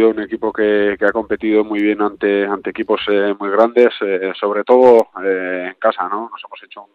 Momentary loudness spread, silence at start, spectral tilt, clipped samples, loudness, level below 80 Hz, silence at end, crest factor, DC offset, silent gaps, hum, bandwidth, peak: 11 LU; 0 s; -6.5 dB/octave; under 0.1%; -16 LUFS; -56 dBFS; 0.1 s; 16 dB; under 0.1%; none; none; 6.6 kHz; 0 dBFS